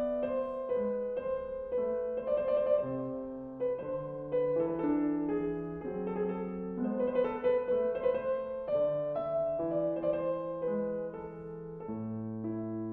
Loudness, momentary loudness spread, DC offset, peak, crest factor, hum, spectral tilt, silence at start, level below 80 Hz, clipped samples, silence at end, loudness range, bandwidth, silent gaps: -34 LUFS; 8 LU; under 0.1%; -18 dBFS; 14 dB; none; -11 dB/octave; 0 s; -62 dBFS; under 0.1%; 0 s; 3 LU; 3.8 kHz; none